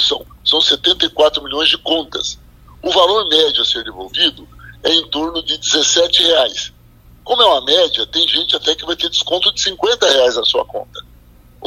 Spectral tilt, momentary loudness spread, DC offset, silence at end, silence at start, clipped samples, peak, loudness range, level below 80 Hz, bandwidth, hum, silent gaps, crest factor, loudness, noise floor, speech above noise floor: -1 dB/octave; 11 LU; under 0.1%; 0 s; 0 s; under 0.1%; 0 dBFS; 2 LU; -44 dBFS; 16 kHz; none; none; 16 dB; -13 LUFS; -44 dBFS; 29 dB